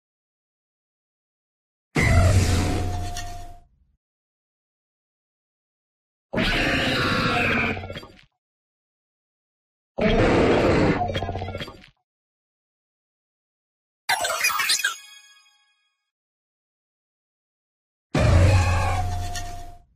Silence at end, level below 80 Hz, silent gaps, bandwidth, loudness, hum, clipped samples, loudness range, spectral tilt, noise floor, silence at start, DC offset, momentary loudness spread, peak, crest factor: 0.2 s; -36 dBFS; 3.97-6.29 s, 8.38-9.95 s, 12.04-14.08 s, 16.11-18.10 s; 15.5 kHz; -22 LUFS; none; under 0.1%; 8 LU; -5 dB/octave; -69 dBFS; 1.95 s; under 0.1%; 17 LU; -6 dBFS; 20 dB